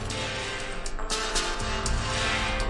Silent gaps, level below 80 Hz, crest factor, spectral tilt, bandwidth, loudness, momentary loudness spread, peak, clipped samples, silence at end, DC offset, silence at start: none; -34 dBFS; 16 dB; -2.5 dB/octave; 11.5 kHz; -29 LUFS; 7 LU; -12 dBFS; under 0.1%; 0 s; under 0.1%; 0 s